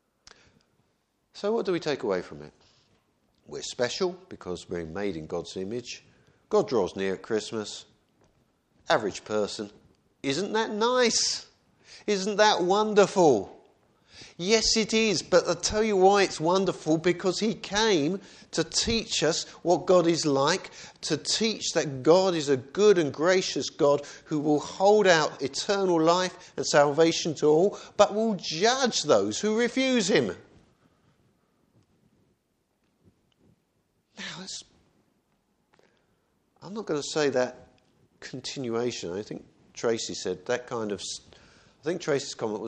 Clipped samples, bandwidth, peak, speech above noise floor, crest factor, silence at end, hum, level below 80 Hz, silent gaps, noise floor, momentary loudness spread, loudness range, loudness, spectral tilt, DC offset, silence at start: under 0.1%; 9.6 kHz; -4 dBFS; 48 dB; 24 dB; 0 s; none; -58 dBFS; none; -74 dBFS; 15 LU; 10 LU; -26 LUFS; -3.5 dB/octave; under 0.1%; 1.35 s